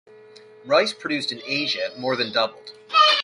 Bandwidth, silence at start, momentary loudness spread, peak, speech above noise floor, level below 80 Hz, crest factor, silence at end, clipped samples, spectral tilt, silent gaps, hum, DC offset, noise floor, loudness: 11.5 kHz; 0.65 s; 8 LU; -4 dBFS; 24 dB; -72 dBFS; 20 dB; 0 s; under 0.1%; -3 dB/octave; none; none; under 0.1%; -47 dBFS; -22 LUFS